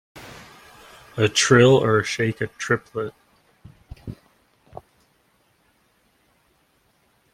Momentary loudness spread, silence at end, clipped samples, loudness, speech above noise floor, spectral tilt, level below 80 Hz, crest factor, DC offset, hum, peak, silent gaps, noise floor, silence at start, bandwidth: 27 LU; 3.2 s; under 0.1%; -19 LUFS; 45 dB; -4.5 dB/octave; -56 dBFS; 22 dB; under 0.1%; none; -2 dBFS; none; -64 dBFS; 0.15 s; 15 kHz